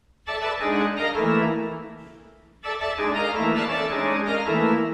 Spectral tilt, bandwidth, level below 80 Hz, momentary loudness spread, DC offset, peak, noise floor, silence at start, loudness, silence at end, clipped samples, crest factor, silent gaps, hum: -6 dB/octave; 10.5 kHz; -54 dBFS; 11 LU; under 0.1%; -10 dBFS; -50 dBFS; 0.25 s; -24 LUFS; 0 s; under 0.1%; 14 dB; none; none